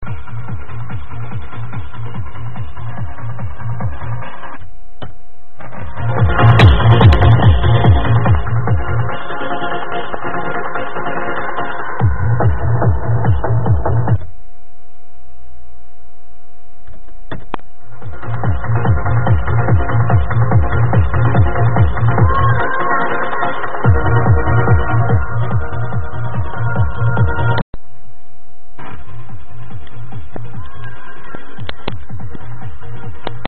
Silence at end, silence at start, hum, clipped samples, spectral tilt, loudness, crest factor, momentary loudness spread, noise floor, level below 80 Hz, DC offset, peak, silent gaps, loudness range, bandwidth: 0 s; 0 s; none; under 0.1%; -6.5 dB/octave; -15 LUFS; 18 dB; 21 LU; -48 dBFS; -26 dBFS; 20%; 0 dBFS; 27.62-27.73 s; 19 LU; 4.2 kHz